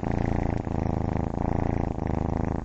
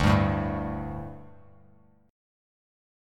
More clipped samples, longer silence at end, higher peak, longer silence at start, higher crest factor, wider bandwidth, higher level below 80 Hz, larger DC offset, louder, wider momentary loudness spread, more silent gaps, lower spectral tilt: neither; second, 0 s vs 0.95 s; about the same, -10 dBFS vs -8 dBFS; about the same, 0 s vs 0 s; about the same, 18 dB vs 22 dB; second, 7.6 kHz vs 12 kHz; first, -34 dBFS vs -42 dBFS; neither; about the same, -28 LUFS vs -29 LUFS; second, 2 LU vs 19 LU; neither; first, -9.5 dB/octave vs -7.5 dB/octave